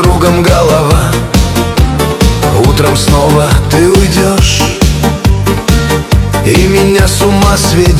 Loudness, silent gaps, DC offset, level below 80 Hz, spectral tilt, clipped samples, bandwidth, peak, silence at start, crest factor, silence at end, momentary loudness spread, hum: -8 LUFS; none; under 0.1%; -14 dBFS; -5 dB/octave; 1%; 16 kHz; 0 dBFS; 0 s; 8 dB; 0 s; 3 LU; none